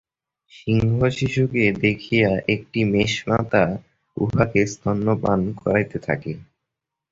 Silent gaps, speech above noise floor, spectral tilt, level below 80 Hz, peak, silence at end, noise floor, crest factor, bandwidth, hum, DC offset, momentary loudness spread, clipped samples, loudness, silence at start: none; 63 dB; -6.5 dB/octave; -46 dBFS; -2 dBFS; 0.7 s; -83 dBFS; 20 dB; 7.8 kHz; none; under 0.1%; 8 LU; under 0.1%; -21 LUFS; 0.6 s